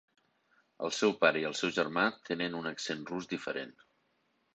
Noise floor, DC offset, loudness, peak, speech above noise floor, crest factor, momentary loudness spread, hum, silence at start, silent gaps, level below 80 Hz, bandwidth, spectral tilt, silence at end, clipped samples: -75 dBFS; under 0.1%; -33 LUFS; -12 dBFS; 43 dB; 24 dB; 11 LU; none; 0.8 s; none; -76 dBFS; 9 kHz; -3.5 dB/octave; 0.85 s; under 0.1%